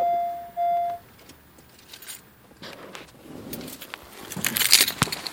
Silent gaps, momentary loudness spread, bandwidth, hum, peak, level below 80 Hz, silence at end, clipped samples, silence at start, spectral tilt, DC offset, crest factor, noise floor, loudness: none; 26 LU; 17 kHz; none; 0 dBFS; -58 dBFS; 0 s; under 0.1%; 0 s; -1.5 dB/octave; under 0.1%; 28 dB; -52 dBFS; -22 LUFS